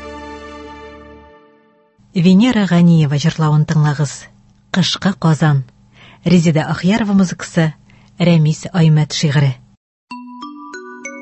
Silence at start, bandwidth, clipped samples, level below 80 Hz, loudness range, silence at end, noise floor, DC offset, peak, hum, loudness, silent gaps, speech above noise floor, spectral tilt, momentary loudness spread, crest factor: 0 s; 8.4 kHz; under 0.1%; -48 dBFS; 2 LU; 0 s; -52 dBFS; under 0.1%; -2 dBFS; none; -14 LUFS; 9.77-10.07 s; 39 dB; -6.5 dB/octave; 21 LU; 14 dB